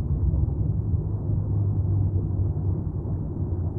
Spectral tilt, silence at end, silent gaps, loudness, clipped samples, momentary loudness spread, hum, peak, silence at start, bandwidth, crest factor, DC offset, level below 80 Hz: -14.5 dB/octave; 0 s; none; -26 LUFS; under 0.1%; 5 LU; none; -12 dBFS; 0 s; 1.5 kHz; 12 dB; 0.2%; -32 dBFS